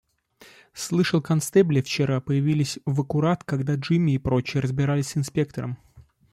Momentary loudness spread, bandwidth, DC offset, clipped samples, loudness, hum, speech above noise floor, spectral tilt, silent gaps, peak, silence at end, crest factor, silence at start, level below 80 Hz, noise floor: 8 LU; 13.5 kHz; under 0.1%; under 0.1%; -24 LUFS; none; 31 dB; -6.5 dB/octave; none; -6 dBFS; 0.3 s; 16 dB; 0.75 s; -52 dBFS; -54 dBFS